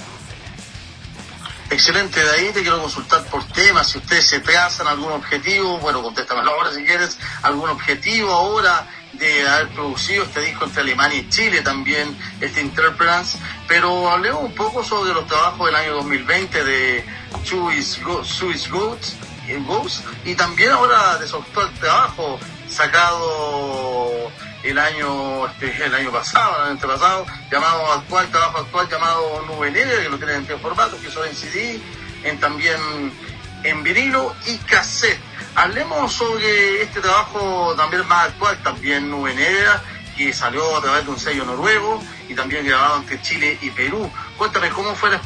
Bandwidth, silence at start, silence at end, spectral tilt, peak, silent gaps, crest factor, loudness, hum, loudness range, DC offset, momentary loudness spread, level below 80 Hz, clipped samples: 10.5 kHz; 0 s; 0 s; -2.5 dB/octave; 0 dBFS; none; 18 dB; -17 LUFS; none; 5 LU; under 0.1%; 11 LU; -46 dBFS; under 0.1%